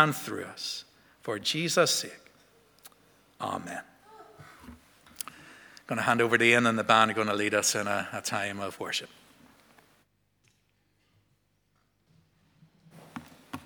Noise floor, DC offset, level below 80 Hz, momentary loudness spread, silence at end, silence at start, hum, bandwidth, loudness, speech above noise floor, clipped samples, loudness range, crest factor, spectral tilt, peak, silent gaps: -72 dBFS; under 0.1%; -72 dBFS; 24 LU; 0.05 s; 0 s; none; over 20 kHz; -27 LUFS; 44 dB; under 0.1%; 17 LU; 28 dB; -3 dB/octave; -4 dBFS; none